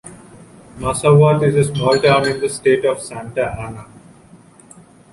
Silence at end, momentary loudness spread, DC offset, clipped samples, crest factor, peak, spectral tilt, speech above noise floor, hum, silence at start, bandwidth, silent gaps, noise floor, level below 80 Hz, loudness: 1.3 s; 14 LU; under 0.1%; under 0.1%; 16 dB; -2 dBFS; -5.5 dB/octave; 30 dB; none; 0.05 s; 11.5 kHz; none; -45 dBFS; -46 dBFS; -16 LUFS